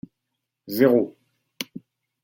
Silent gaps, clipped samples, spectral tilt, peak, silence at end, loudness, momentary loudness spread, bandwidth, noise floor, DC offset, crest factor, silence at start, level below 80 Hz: none; under 0.1%; -6 dB/octave; -4 dBFS; 0.45 s; -21 LUFS; 16 LU; 17 kHz; -81 dBFS; under 0.1%; 22 dB; 0.65 s; -70 dBFS